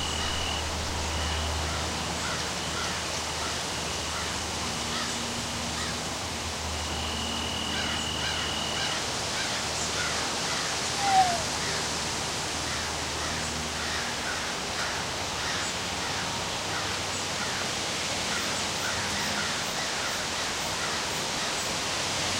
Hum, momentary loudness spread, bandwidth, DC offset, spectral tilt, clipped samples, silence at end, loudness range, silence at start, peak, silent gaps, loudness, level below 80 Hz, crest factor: none; 3 LU; 16 kHz; under 0.1%; -2 dB/octave; under 0.1%; 0 s; 3 LU; 0 s; -12 dBFS; none; -28 LUFS; -44 dBFS; 18 dB